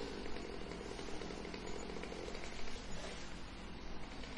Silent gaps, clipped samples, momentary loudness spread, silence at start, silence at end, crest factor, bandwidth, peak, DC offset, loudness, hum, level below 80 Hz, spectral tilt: none; under 0.1%; 4 LU; 0 s; 0 s; 14 dB; 11 kHz; -30 dBFS; under 0.1%; -47 LUFS; none; -52 dBFS; -4 dB/octave